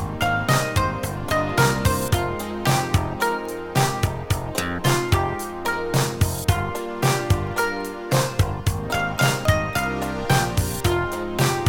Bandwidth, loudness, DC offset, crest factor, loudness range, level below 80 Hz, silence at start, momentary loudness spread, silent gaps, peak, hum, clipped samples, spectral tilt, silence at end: 18 kHz; -22 LUFS; under 0.1%; 18 dB; 1 LU; -36 dBFS; 0 s; 6 LU; none; -4 dBFS; none; under 0.1%; -5 dB/octave; 0 s